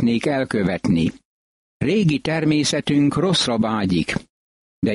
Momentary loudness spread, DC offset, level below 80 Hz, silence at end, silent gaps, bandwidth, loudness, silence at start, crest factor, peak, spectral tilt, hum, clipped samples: 7 LU; under 0.1%; -48 dBFS; 0 s; 1.25-1.80 s, 4.29-4.82 s; 11.5 kHz; -20 LUFS; 0 s; 14 dB; -6 dBFS; -5.5 dB/octave; none; under 0.1%